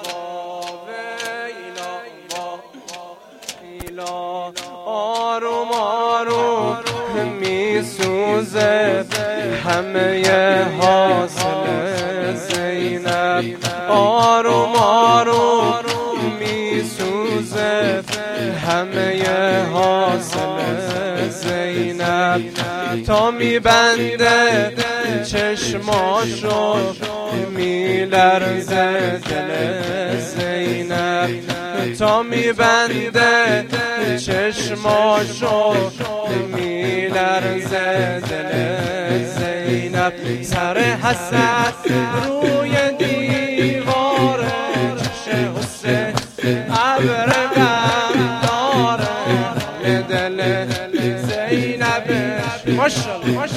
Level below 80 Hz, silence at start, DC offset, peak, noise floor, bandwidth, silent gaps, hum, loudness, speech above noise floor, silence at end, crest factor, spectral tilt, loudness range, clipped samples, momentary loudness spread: -48 dBFS; 0 s; under 0.1%; 0 dBFS; -38 dBFS; 16 kHz; none; none; -18 LUFS; 21 dB; 0 s; 18 dB; -4.5 dB/octave; 5 LU; under 0.1%; 9 LU